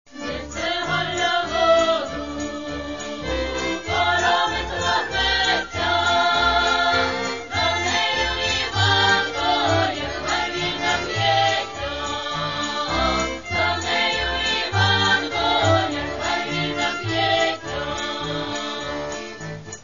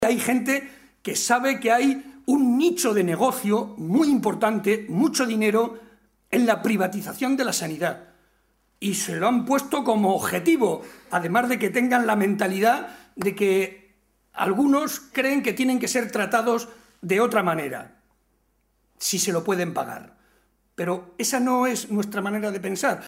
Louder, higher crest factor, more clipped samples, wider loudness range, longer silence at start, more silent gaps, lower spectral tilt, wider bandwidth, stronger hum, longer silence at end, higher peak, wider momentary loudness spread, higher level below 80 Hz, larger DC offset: about the same, -21 LUFS vs -23 LUFS; about the same, 16 dB vs 18 dB; neither; about the same, 3 LU vs 4 LU; about the same, 0.1 s vs 0 s; neither; about the same, -3.5 dB/octave vs -4 dB/octave; second, 7.4 kHz vs 16 kHz; neither; about the same, 0 s vs 0 s; about the same, -6 dBFS vs -6 dBFS; about the same, 10 LU vs 8 LU; first, -40 dBFS vs -66 dBFS; first, 0.4% vs under 0.1%